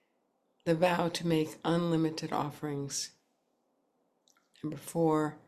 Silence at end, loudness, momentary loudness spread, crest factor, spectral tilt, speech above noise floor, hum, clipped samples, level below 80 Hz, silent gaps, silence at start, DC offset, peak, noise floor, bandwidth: 0.1 s; -32 LUFS; 11 LU; 20 dB; -5.5 dB/octave; 45 dB; none; under 0.1%; -70 dBFS; none; 0.65 s; under 0.1%; -14 dBFS; -76 dBFS; 14 kHz